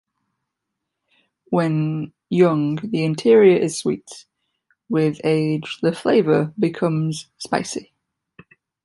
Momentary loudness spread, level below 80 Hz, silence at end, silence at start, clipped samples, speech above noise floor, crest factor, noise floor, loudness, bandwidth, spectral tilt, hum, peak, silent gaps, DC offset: 11 LU; -64 dBFS; 1 s; 1.5 s; under 0.1%; 62 dB; 18 dB; -80 dBFS; -20 LUFS; 11.5 kHz; -6.5 dB/octave; none; -2 dBFS; none; under 0.1%